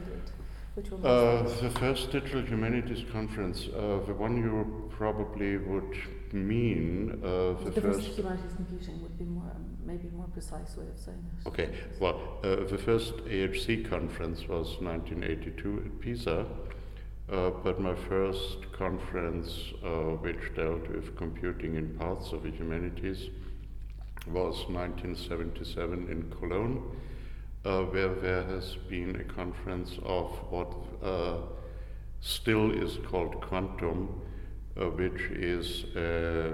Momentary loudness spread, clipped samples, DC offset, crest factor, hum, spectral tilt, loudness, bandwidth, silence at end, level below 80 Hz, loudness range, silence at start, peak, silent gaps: 13 LU; under 0.1%; under 0.1%; 20 dB; 50 Hz at -45 dBFS; -6.5 dB/octave; -34 LUFS; 16.5 kHz; 0 s; -40 dBFS; 5 LU; 0 s; -12 dBFS; none